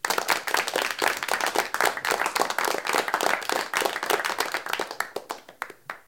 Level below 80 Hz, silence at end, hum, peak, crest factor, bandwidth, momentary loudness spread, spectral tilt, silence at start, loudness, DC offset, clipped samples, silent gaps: -66 dBFS; 0.1 s; none; -4 dBFS; 24 dB; 17 kHz; 10 LU; -0.5 dB/octave; 0.05 s; -25 LUFS; under 0.1%; under 0.1%; none